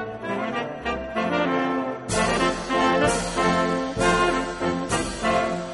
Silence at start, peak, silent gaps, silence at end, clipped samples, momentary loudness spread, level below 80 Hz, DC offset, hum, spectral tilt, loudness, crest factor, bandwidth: 0 s; -6 dBFS; none; 0 s; under 0.1%; 8 LU; -42 dBFS; under 0.1%; none; -4.5 dB/octave; -23 LUFS; 16 dB; 11.5 kHz